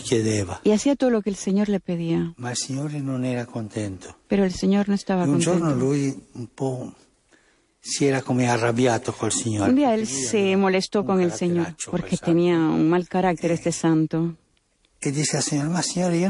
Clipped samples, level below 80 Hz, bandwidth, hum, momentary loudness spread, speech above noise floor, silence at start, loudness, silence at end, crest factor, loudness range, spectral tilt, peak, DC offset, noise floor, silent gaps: under 0.1%; -54 dBFS; 11.5 kHz; none; 9 LU; 43 dB; 0 s; -23 LUFS; 0 s; 14 dB; 4 LU; -5.5 dB/octave; -8 dBFS; under 0.1%; -65 dBFS; none